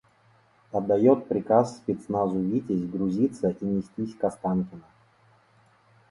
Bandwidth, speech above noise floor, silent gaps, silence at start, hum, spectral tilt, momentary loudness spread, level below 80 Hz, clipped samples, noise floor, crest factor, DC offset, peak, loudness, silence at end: 11 kHz; 36 dB; none; 0.75 s; none; -9 dB/octave; 9 LU; -60 dBFS; under 0.1%; -61 dBFS; 20 dB; under 0.1%; -6 dBFS; -26 LUFS; 1.3 s